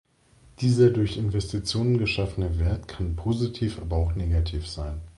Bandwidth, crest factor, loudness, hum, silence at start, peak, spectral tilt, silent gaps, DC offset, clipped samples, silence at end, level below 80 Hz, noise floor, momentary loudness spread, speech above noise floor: 11.5 kHz; 16 dB; -26 LUFS; none; 0.6 s; -8 dBFS; -7 dB/octave; none; under 0.1%; under 0.1%; 0.05 s; -32 dBFS; -57 dBFS; 10 LU; 32 dB